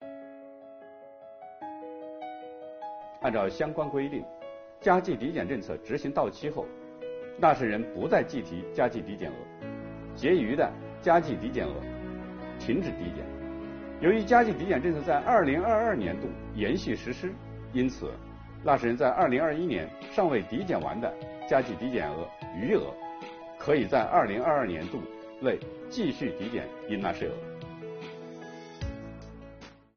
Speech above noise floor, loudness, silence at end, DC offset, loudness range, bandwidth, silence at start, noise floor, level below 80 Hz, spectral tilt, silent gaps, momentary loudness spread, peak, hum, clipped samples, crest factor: 22 dB; -29 LUFS; 0.25 s; under 0.1%; 8 LU; 6.8 kHz; 0 s; -50 dBFS; -52 dBFS; -5 dB/octave; none; 18 LU; -8 dBFS; none; under 0.1%; 22 dB